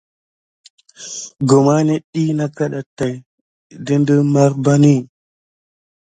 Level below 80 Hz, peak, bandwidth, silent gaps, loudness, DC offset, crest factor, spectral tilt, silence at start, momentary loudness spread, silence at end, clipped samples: -58 dBFS; 0 dBFS; 9.4 kHz; 2.04-2.13 s, 2.86-2.97 s, 3.26-3.70 s; -15 LUFS; under 0.1%; 16 dB; -7 dB/octave; 1 s; 16 LU; 1.1 s; under 0.1%